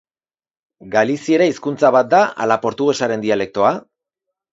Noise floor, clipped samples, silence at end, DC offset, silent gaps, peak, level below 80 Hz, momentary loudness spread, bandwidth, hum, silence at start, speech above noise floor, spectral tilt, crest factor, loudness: under -90 dBFS; under 0.1%; 0.75 s; under 0.1%; none; 0 dBFS; -62 dBFS; 5 LU; 8 kHz; none; 0.85 s; over 74 dB; -5 dB/octave; 18 dB; -16 LUFS